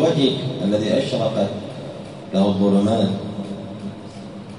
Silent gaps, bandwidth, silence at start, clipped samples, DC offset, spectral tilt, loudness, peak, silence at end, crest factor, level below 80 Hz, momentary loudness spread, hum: none; 11 kHz; 0 s; under 0.1%; 0.1%; -7 dB/octave; -21 LUFS; -4 dBFS; 0 s; 16 dB; -56 dBFS; 16 LU; none